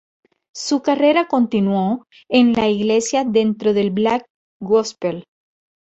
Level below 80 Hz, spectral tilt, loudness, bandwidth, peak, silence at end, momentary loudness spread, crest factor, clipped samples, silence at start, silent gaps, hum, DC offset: -58 dBFS; -5 dB/octave; -18 LUFS; 8.2 kHz; -2 dBFS; 0.7 s; 11 LU; 16 dB; under 0.1%; 0.55 s; 4.30-4.60 s; none; under 0.1%